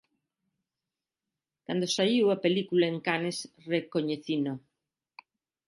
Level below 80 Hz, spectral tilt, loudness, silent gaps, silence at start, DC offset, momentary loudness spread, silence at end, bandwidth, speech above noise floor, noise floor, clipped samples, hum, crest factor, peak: -78 dBFS; -5 dB/octave; -29 LUFS; none; 1.7 s; under 0.1%; 10 LU; 1.1 s; 11.5 kHz; 62 dB; -90 dBFS; under 0.1%; none; 20 dB; -12 dBFS